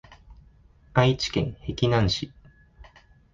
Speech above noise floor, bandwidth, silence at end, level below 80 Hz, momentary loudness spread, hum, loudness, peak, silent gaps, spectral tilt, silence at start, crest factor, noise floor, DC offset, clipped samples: 32 dB; 7.4 kHz; 0.5 s; -44 dBFS; 8 LU; none; -25 LUFS; -4 dBFS; none; -6 dB/octave; 0.1 s; 24 dB; -55 dBFS; under 0.1%; under 0.1%